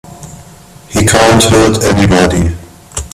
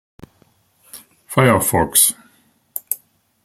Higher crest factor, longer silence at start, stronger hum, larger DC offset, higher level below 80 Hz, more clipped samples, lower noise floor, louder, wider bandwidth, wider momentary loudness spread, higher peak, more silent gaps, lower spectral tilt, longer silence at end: second, 10 dB vs 20 dB; second, 0.05 s vs 0.95 s; neither; neither; first, -28 dBFS vs -50 dBFS; neither; second, -36 dBFS vs -58 dBFS; first, -9 LUFS vs -16 LUFS; about the same, 16 kHz vs 16.5 kHz; about the same, 16 LU vs 18 LU; about the same, 0 dBFS vs 0 dBFS; neither; about the same, -4.5 dB/octave vs -3.5 dB/octave; second, 0.05 s vs 0.5 s